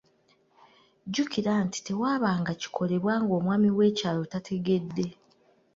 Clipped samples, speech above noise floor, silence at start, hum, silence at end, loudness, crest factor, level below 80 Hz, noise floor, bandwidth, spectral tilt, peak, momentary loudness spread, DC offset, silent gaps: under 0.1%; 39 dB; 1.05 s; none; 0.65 s; -28 LUFS; 16 dB; -66 dBFS; -66 dBFS; 7.8 kHz; -6 dB/octave; -12 dBFS; 9 LU; under 0.1%; none